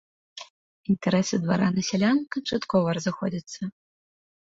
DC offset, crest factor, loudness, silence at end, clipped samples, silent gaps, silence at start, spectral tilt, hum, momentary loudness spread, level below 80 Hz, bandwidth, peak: under 0.1%; 16 dB; -25 LUFS; 0.7 s; under 0.1%; 0.50-0.84 s; 0.35 s; -5.5 dB/octave; none; 18 LU; -60 dBFS; 7.8 kHz; -10 dBFS